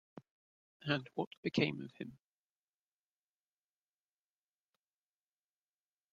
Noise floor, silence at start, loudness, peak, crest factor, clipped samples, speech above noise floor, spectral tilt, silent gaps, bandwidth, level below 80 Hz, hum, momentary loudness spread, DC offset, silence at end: under -90 dBFS; 0.15 s; -39 LUFS; -18 dBFS; 28 dB; under 0.1%; over 51 dB; -6.5 dB/octave; 0.31-0.80 s, 1.27-1.31 s, 1.37-1.43 s; 7.8 kHz; -80 dBFS; 50 Hz at -70 dBFS; 14 LU; under 0.1%; 3.95 s